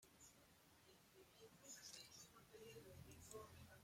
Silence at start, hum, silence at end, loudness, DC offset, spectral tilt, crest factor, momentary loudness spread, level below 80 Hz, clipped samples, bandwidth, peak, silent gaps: 0 s; none; 0 s; -62 LUFS; under 0.1%; -3 dB/octave; 22 dB; 10 LU; -80 dBFS; under 0.1%; 16.5 kHz; -42 dBFS; none